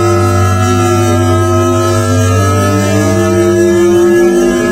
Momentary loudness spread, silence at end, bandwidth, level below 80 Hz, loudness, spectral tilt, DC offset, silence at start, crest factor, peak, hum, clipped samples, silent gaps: 3 LU; 0 s; 16 kHz; -36 dBFS; -9 LUFS; -6 dB/octave; under 0.1%; 0 s; 8 dB; 0 dBFS; none; under 0.1%; none